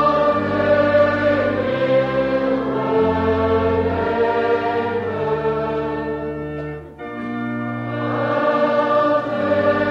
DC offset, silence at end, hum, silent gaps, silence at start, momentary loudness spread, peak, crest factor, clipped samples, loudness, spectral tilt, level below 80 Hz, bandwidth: under 0.1%; 0 s; none; none; 0 s; 10 LU; -4 dBFS; 14 dB; under 0.1%; -19 LUFS; -8 dB/octave; -44 dBFS; 6.8 kHz